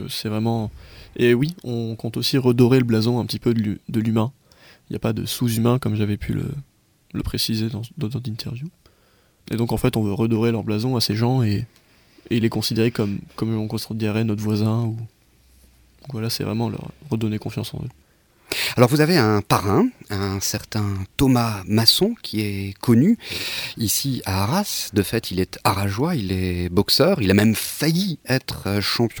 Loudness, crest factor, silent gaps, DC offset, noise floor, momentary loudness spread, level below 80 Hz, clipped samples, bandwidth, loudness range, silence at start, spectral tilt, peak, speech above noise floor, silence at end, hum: -21 LUFS; 22 dB; none; under 0.1%; -58 dBFS; 12 LU; -46 dBFS; under 0.1%; over 20 kHz; 6 LU; 0 s; -5.5 dB/octave; 0 dBFS; 37 dB; 0 s; none